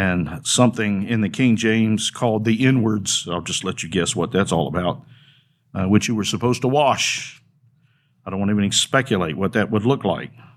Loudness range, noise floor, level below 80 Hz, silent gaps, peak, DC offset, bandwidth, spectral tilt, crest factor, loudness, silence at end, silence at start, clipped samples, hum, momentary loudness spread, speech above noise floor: 3 LU; -60 dBFS; -52 dBFS; none; -2 dBFS; under 0.1%; 15 kHz; -4.5 dB/octave; 20 dB; -20 LUFS; 0.3 s; 0 s; under 0.1%; none; 8 LU; 41 dB